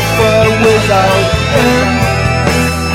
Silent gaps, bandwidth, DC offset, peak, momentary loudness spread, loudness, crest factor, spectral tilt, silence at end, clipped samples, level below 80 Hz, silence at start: none; 16.5 kHz; under 0.1%; 0 dBFS; 3 LU; -10 LUFS; 10 dB; -5 dB/octave; 0 s; under 0.1%; -24 dBFS; 0 s